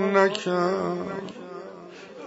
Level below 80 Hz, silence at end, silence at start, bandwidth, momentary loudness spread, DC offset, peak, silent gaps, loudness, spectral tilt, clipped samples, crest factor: -72 dBFS; 0 s; 0 s; 8 kHz; 20 LU; under 0.1%; -6 dBFS; none; -25 LUFS; -5.5 dB/octave; under 0.1%; 20 dB